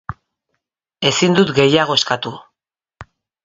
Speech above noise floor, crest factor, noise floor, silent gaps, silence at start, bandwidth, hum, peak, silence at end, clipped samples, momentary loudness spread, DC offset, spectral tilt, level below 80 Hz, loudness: 67 dB; 18 dB; -82 dBFS; none; 0.1 s; 8 kHz; none; 0 dBFS; 0.4 s; under 0.1%; 12 LU; under 0.1%; -4 dB/octave; -50 dBFS; -15 LUFS